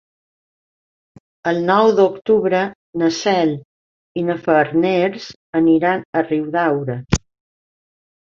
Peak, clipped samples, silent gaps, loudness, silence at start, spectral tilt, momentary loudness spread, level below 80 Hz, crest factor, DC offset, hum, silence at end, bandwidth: -2 dBFS; under 0.1%; 2.75-2.93 s, 3.65-4.15 s, 5.36-5.53 s, 6.05-6.13 s; -18 LUFS; 1.45 s; -6 dB/octave; 10 LU; -44 dBFS; 18 dB; under 0.1%; none; 1.1 s; 7.8 kHz